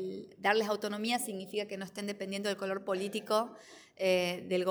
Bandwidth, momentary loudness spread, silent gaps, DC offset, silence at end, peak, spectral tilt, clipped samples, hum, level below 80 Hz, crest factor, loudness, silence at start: over 20 kHz; 10 LU; none; under 0.1%; 0 s; -14 dBFS; -4 dB/octave; under 0.1%; none; -82 dBFS; 20 dB; -34 LUFS; 0 s